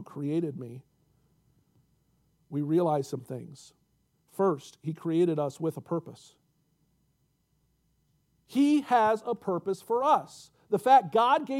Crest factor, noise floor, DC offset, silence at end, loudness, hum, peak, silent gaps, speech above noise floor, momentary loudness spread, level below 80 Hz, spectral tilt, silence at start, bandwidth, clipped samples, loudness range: 20 dB; -73 dBFS; under 0.1%; 0 s; -28 LUFS; none; -10 dBFS; none; 45 dB; 17 LU; -76 dBFS; -6.5 dB/octave; 0 s; 15.5 kHz; under 0.1%; 8 LU